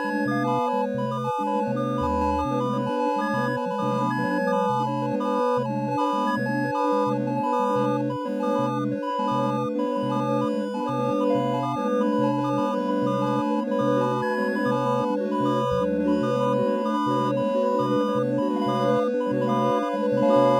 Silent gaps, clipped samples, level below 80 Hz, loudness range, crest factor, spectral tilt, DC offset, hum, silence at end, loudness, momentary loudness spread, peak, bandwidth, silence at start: none; under 0.1%; -54 dBFS; 2 LU; 16 dB; -7.5 dB/octave; under 0.1%; none; 0 s; -24 LUFS; 3 LU; -8 dBFS; 14 kHz; 0 s